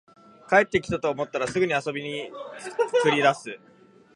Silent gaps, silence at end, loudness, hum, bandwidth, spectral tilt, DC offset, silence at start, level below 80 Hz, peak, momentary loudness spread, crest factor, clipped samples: none; 0.6 s; -24 LUFS; none; 11.5 kHz; -4.5 dB/octave; under 0.1%; 0.5 s; -58 dBFS; -4 dBFS; 16 LU; 22 dB; under 0.1%